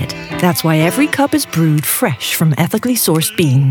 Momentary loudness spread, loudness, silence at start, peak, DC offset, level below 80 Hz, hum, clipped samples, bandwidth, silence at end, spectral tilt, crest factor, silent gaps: 3 LU; -14 LUFS; 0 s; 0 dBFS; under 0.1%; -50 dBFS; none; under 0.1%; over 20 kHz; 0 s; -5 dB/octave; 14 dB; none